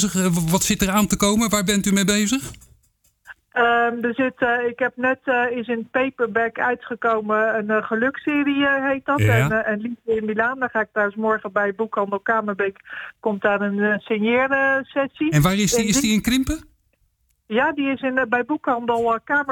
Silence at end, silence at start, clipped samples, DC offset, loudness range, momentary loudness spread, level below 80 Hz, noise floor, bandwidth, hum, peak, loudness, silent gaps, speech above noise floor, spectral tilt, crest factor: 0 s; 0 s; under 0.1%; under 0.1%; 3 LU; 6 LU; -46 dBFS; -66 dBFS; 19.5 kHz; none; -8 dBFS; -20 LUFS; none; 45 dB; -4.5 dB/octave; 14 dB